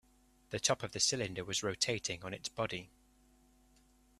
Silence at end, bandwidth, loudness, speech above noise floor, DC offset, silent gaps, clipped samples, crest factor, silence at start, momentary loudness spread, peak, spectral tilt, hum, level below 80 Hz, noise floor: 1.35 s; 14.5 kHz; -36 LUFS; 30 dB; under 0.1%; none; under 0.1%; 24 dB; 0.5 s; 10 LU; -16 dBFS; -2 dB/octave; none; -66 dBFS; -67 dBFS